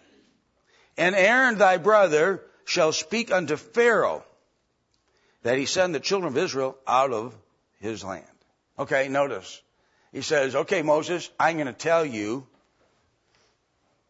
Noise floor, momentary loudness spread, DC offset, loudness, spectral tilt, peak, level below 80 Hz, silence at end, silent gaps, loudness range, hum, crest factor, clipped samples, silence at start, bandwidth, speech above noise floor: -71 dBFS; 17 LU; under 0.1%; -23 LUFS; -3.5 dB/octave; -6 dBFS; -72 dBFS; 1.65 s; none; 7 LU; none; 20 dB; under 0.1%; 1 s; 8 kHz; 48 dB